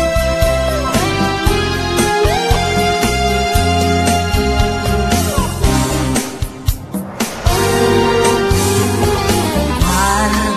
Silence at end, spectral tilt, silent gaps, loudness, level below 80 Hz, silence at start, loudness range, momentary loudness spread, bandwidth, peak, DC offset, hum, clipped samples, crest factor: 0 s; -4.5 dB/octave; none; -14 LUFS; -22 dBFS; 0 s; 2 LU; 5 LU; 14 kHz; 0 dBFS; under 0.1%; none; under 0.1%; 14 dB